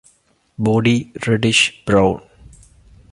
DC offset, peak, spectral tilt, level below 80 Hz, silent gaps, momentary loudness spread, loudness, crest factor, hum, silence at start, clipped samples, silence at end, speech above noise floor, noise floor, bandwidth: under 0.1%; -2 dBFS; -4.5 dB/octave; -44 dBFS; none; 7 LU; -16 LUFS; 18 dB; none; 0.6 s; under 0.1%; 0.95 s; 42 dB; -58 dBFS; 11.5 kHz